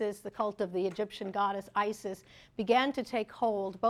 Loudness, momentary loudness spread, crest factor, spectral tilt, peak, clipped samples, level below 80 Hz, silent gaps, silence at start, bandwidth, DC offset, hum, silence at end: -33 LUFS; 12 LU; 18 dB; -5 dB/octave; -14 dBFS; under 0.1%; -68 dBFS; none; 0 s; 14.5 kHz; under 0.1%; none; 0 s